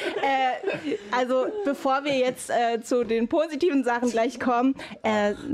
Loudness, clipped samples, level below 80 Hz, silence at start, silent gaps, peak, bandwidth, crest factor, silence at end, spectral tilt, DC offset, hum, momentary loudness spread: -25 LUFS; under 0.1%; -62 dBFS; 0 s; none; -14 dBFS; 14.5 kHz; 10 dB; 0 s; -4.5 dB/octave; under 0.1%; none; 4 LU